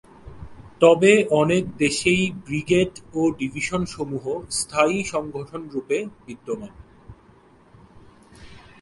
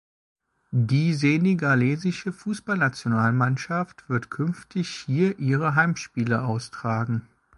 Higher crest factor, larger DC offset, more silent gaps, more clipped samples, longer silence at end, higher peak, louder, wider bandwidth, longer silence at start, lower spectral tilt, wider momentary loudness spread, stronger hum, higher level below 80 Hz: about the same, 20 dB vs 18 dB; neither; neither; neither; about the same, 0.25 s vs 0.35 s; first, -2 dBFS vs -6 dBFS; about the same, -22 LUFS vs -24 LUFS; about the same, 11.5 kHz vs 11.5 kHz; second, 0.25 s vs 0.7 s; second, -4.5 dB/octave vs -7 dB/octave; first, 16 LU vs 9 LU; neither; first, -50 dBFS vs -62 dBFS